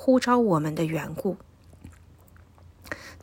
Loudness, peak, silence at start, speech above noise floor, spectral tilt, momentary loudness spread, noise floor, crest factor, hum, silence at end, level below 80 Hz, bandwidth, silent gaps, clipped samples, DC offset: -25 LUFS; -8 dBFS; 0 s; 29 dB; -6.5 dB/octave; 18 LU; -53 dBFS; 18 dB; none; 0.05 s; -58 dBFS; 16 kHz; none; under 0.1%; under 0.1%